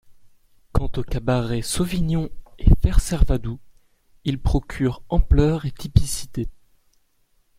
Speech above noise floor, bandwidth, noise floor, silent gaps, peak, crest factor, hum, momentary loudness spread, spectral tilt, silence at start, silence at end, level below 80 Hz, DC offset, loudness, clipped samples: 42 dB; 15.5 kHz; -62 dBFS; none; -2 dBFS; 20 dB; none; 12 LU; -6 dB/octave; 0.1 s; 1.05 s; -24 dBFS; under 0.1%; -23 LUFS; under 0.1%